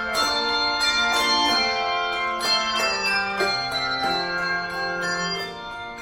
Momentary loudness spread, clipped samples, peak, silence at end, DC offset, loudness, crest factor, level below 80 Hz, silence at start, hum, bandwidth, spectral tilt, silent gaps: 7 LU; under 0.1%; -8 dBFS; 0 s; under 0.1%; -22 LUFS; 16 dB; -52 dBFS; 0 s; none; 16.5 kHz; -1.5 dB/octave; none